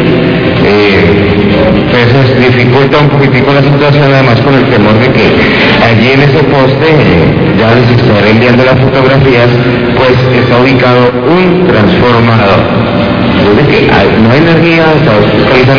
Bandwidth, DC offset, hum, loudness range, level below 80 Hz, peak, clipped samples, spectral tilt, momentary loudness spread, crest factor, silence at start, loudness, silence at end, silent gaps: 5.4 kHz; 1%; none; 1 LU; -26 dBFS; 0 dBFS; 7%; -8 dB/octave; 2 LU; 4 dB; 0 s; -5 LUFS; 0 s; none